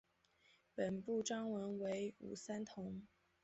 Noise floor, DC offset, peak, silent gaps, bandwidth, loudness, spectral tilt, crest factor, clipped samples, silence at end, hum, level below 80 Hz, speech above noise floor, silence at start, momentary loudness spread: -75 dBFS; under 0.1%; -28 dBFS; none; 8 kHz; -45 LUFS; -5.5 dB/octave; 18 dB; under 0.1%; 0.4 s; none; -78 dBFS; 31 dB; 0.75 s; 10 LU